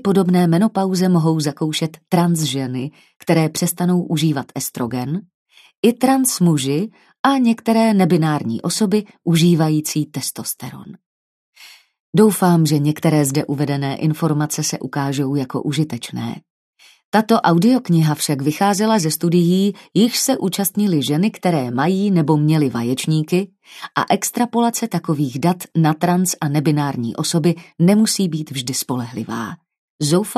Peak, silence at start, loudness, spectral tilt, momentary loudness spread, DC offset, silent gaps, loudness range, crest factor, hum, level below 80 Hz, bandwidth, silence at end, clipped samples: 0 dBFS; 0.05 s; -18 LUFS; -5.5 dB/octave; 9 LU; under 0.1%; 5.34-5.46 s, 5.77-5.83 s, 7.19-7.24 s, 11.06-11.53 s, 12.00-12.13 s, 16.50-16.73 s, 17.05-17.12 s, 29.78-29.99 s; 3 LU; 18 dB; none; -62 dBFS; 14 kHz; 0.05 s; under 0.1%